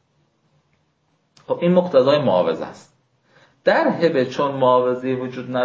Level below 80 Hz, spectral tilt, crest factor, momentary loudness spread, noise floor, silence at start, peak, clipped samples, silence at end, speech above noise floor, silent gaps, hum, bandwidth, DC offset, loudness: -66 dBFS; -7 dB/octave; 16 dB; 10 LU; -66 dBFS; 1.5 s; -4 dBFS; under 0.1%; 0 s; 48 dB; none; none; 7.4 kHz; under 0.1%; -19 LUFS